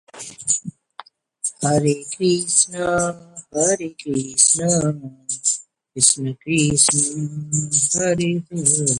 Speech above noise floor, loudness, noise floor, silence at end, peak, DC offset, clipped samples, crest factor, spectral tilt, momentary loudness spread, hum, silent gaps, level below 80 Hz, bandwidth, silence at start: 24 dB; -18 LUFS; -44 dBFS; 0 s; 0 dBFS; under 0.1%; under 0.1%; 20 dB; -3.5 dB/octave; 13 LU; none; none; -54 dBFS; 11.5 kHz; 0.15 s